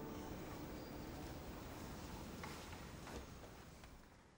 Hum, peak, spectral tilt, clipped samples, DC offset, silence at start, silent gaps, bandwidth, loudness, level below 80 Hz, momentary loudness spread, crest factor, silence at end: none; -36 dBFS; -5 dB/octave; under 0.1%; under 0.1%; 0 s; none; over 20 kHz; -52 LUFS; -60 dBFS; 8 LU; 16 dB; 0 s